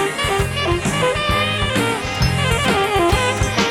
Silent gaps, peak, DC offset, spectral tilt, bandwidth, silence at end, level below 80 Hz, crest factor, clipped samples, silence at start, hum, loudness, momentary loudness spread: none; -4 dBFS; under 0.1%; -4 dB/octave; 17.5 kHz; 0 s; -30 dBFS; 14 dB; under 0.1%; 0 s; none; -18 LUFS; 3 LU